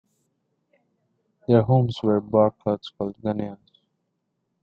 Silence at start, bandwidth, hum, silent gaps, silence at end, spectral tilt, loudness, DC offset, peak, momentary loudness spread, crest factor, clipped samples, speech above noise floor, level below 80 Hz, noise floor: 1.5 s; 6.8 kHz; none; none; 1.05 s; -9.5 dB/octave; -23 LUFS; under 0.1%; -4 dBFS; 13 LU; 20 dB; under 0.1%; 54 dB; -60 dBFS; -76 dBFS